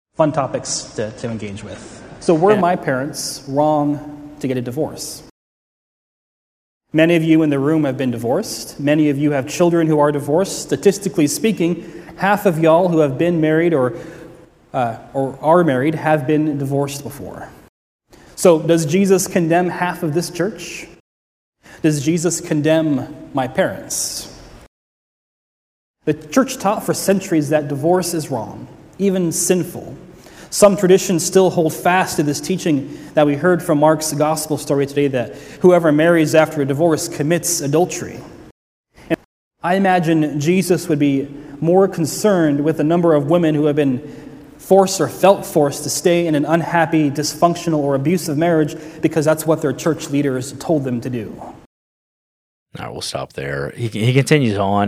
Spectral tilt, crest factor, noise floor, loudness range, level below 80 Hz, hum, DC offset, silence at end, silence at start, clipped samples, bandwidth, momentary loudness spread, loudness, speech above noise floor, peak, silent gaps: -5.5 dB/octave; 18 dB; -42 dBFS; 6 LU; -54 dBFS; none; under 0.1%; 0 s; 0.2 s; under 0.1%; 16 kHz; 13 LU; -17 LUFS; 26 dB; 0 dBFS; 5.31-6.81 s, 17.69-17.99 s, 21.00-21.52 s, 24.68-25.94 s, 38.51-38.84 s, 39.25-39.51 s, 51.66-52.66 s